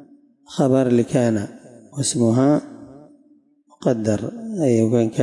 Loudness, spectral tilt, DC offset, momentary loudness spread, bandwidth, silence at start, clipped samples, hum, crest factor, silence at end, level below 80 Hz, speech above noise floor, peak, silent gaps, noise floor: -20 LUFS; -6.5 dB/octave; under 0.1%; 13 LU; 11.5 kHz; 0 s; under 0.1%; none; 16 dB; 0 s; -62 dBFS; 38 dB; -6 dBFS; none; -56 dBFS